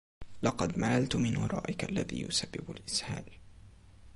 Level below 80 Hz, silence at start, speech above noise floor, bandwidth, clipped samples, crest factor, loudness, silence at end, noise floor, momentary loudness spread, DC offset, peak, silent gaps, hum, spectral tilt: -54 dBFS; 0.2 s; 22 dB; 11.5 kHz; under 0.1%; 20 dB; -33 LUFS; 0 s; -55 dBFS; 12 LU; under 0.1%; -14 dBFS; none; none; -4.5 dB/octave